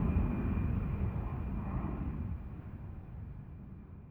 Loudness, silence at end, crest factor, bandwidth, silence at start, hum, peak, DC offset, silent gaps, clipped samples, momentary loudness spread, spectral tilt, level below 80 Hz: -38 LUFS; 0 s; 18 dB; 3.6 kHz; 0 s; none; -20 dBFS; under 0.1%; none; under 0.1%; 15 LU; -11.5 dB/octave; -40 dBFS